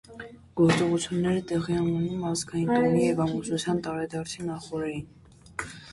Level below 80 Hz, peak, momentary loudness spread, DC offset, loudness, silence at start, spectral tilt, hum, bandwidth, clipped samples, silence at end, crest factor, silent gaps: -56 dBFS; -10 dBFS; 15 LU; under 0.1%; -27 LUFS; 0.1 s; -6 dB/octave; none; 11.5 kHz; under 0.1%; 0 s; 16 dB; none